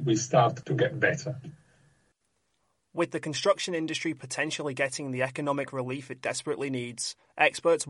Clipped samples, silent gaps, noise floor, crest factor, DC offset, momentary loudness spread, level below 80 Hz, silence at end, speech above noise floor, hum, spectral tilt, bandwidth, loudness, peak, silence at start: under 0.1%; none; -76 dBFS; 22 dB; under 0.1%; 10 LU; -72 dBFS; 0 s; 47 dB; none; -4.5 dB/octave; 11.5 kHz; -29 LUFS; -8 dBFS; 0 s